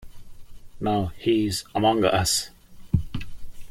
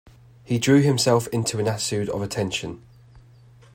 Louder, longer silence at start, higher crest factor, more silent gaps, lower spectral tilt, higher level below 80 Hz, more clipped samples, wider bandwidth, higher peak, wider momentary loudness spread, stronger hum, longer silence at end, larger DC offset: about the same, -24 LUFS vs -22 LUFS; second, 0 s vs 0.5 s; about the same, 18 dB vs 18 dB; neither; about the same, -4.5 dB/octave vs -5 dB/octave; first, -42 dBFS vs -56 dBFS; neither; about the same, 16.5 kHz vs 16 kHz; about the same, -6 dBFS vs -6 dBFS; first, 16 LU vs 11 LU; neither; second, 0 s vs 0.55 s; neither